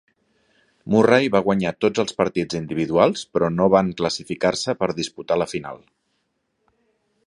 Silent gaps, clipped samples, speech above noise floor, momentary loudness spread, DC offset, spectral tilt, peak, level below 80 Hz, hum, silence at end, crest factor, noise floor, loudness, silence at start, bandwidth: none; under 0.1%; 52 dB; 10 LU; under 0.1%; -5.5 dB/octave; -2 dBFS; -54 dBFS; none; 1.5 s; 20 dB; -72 dBFS; -21 LUFS; 0.85 s; 11.5 kHz